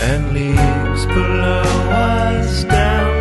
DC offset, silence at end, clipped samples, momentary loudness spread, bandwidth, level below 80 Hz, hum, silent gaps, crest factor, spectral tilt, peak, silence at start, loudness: under 0.1%; 0 s; under 0.1%; 3 LU; 12 kHz; -20 dBFS; none; none; 14 dB; -6 dB/octave; 0 dBFS; 0 s; -16 LUFS